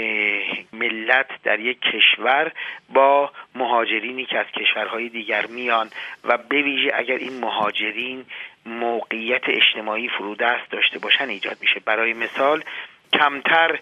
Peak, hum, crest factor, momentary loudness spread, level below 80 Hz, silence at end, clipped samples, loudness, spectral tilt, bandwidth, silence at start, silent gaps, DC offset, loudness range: -2 dBFS; none; 20 dB; 11 LU; -74 dBFS; 0 s; under 0.1%; -20 LUFS; -4 dB/octave; 9 kHz; 0 s; none; under 0.1%; 4 LU